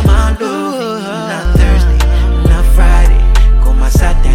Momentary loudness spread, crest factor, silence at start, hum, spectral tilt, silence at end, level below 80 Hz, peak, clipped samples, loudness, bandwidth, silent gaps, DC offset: 8 LU; 8 dB; 0 s; none; -6 dB/octave; 0 s; -8 dBFS; 0 dBFS; under 0.1%; -12 LUFS; 14.5 kHz; none; under 0.1%